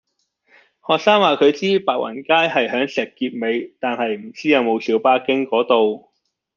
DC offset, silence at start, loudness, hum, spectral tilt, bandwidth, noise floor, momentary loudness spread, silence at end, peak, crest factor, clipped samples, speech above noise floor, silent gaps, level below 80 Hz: under 0.1%; 0.9 s; -18 LUFS; none; -5 dB/octave; 7.2 kHz; -62 dBFS; 9 LU; 0.6 s; -2 dBFS; 18 dB; under 0.1%; 44 dB; none; -70 dBFS